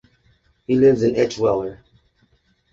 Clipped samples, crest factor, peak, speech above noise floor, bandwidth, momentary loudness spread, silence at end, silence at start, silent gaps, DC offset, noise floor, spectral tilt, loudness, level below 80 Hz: under 0.1%; 16 dB; -4 dBFS; 44 dB; 7.6 kHz; 15 LU; 1 s; 0.7 s; none; under 0.1%; -62 dBFS; -7 dB/octave; -18 LUFS; -52 dBFS